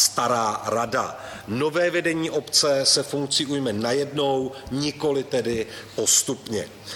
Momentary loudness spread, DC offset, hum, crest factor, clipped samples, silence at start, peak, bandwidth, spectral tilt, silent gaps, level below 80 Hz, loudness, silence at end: 11 LU; under 0.1%; none; 18 dB; under 0.1%; 0 s; -4 dBFS; 17 kHz; -2.5 dB/octave; none; -56 dBFS; -23 LUFS; 0 s